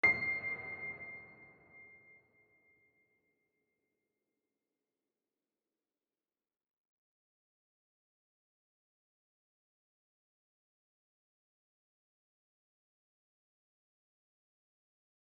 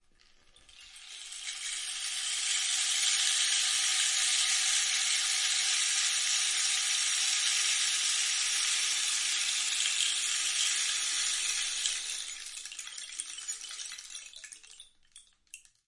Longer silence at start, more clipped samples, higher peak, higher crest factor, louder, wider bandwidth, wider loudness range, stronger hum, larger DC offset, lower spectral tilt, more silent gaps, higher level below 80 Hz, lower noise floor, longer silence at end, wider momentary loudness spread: second, 0.05 s vs 0.75 s; neither; second, -18 dBFS vs -10 dBFS; first, 28 dB vs 22 dB; second, -37 LUFS vs -27 LUFS; second, 4.5 kHz vs 11.5 kHz; first, 23 LU vs 9 LU; neither; neither; first, -2 dB/octave vs 6 dB/octave; neither; second, -80 dBFS vs -72 dBFS; first, under -90 dBFS vs -62 dBFS; first, 13.15 s vs 0.3 s; first, 24 LU vs 14 LU